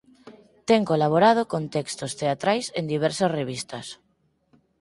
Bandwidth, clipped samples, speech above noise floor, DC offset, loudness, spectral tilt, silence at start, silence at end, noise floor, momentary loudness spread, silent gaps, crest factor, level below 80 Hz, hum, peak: 11.5 kHz; under 0.1%; 43 dB; under 0.1%; -24 LUFS; -5 dB/octave; 0.25 s; 0.85 s; -66 dBFS; 15 LU; none; 20 dB; -64 dBFS; none; -6 dBFS